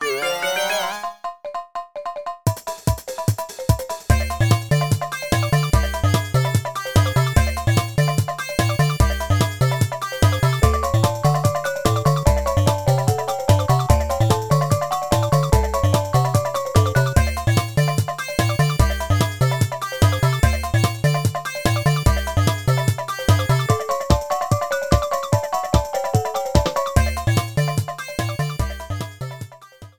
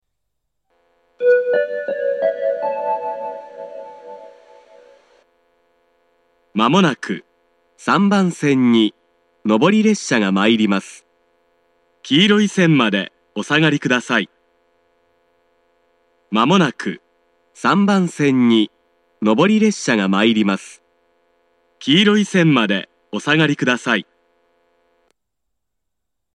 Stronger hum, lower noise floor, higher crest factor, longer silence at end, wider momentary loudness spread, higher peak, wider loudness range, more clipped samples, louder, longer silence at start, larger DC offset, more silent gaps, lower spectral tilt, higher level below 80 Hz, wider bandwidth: neither; second, -43 dBFS vs -80 dBFS; about the same, 20 dB vs 18 dB; second, 0.1 s vs 2.35 s; second, 7 LU vs 14 LU; about the same, 0 dBFS vs 0 dBFS; second, 3 LU vs 6 LU; neither; second, -20 LUFS vs -17 LUFS; second, 0 s vs 1.2 s; first, 0.4% vs under 0.1%; neither; about the same, -5.5 dB/octave vs -5.5 dB/octave; first, -28 dBFS vs -70 dBFS; first, over 20 kHz vs 10.5 kHz